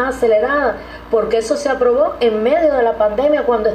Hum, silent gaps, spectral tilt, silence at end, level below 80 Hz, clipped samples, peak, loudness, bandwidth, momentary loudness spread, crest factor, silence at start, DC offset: none; none; -4.5 dB/octave; 0 s; -40 dBFS; under 0.1%; -4 dBFS; -15 LUFS; 12 kHz; 5 LU; 12 dB; 0 s; under 0.1%